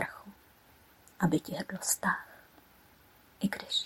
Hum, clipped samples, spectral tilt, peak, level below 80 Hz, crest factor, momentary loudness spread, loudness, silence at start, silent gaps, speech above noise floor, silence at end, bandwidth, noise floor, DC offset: none; under 0.1%; -3.5 dB/octave; -14 dBFS; -68 dBFS; 22 dB; 21 LU; -33 LUFS; 0 s; none; 29 dB; 0 s; 16.5 kHz; -61 dBFS; under 0.1%